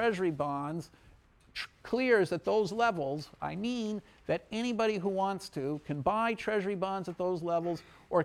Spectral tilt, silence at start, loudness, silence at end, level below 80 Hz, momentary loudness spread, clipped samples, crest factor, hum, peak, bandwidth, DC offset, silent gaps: -6 dB/octave; 0 s; -33 LUFS; 0 s; -64 dBFS; 12 LU; under 0.1%; 18 dB; none; -14 dBFS; 14 kHz; under 0.1%; none